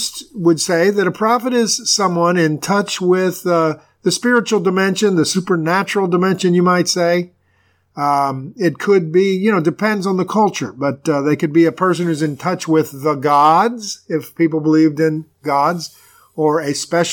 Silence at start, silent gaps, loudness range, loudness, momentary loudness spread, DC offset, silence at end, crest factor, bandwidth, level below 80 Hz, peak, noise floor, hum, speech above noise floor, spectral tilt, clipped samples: 0 s; none; 2 LU; -16 LUFS; 7 LU; under 0.1%; 0 s; 14 dB; 19 kHz; -66 dBFS; -2 dBFS; -59 dBFS; none; 43 dB; -5 dB/octave; under 0.1%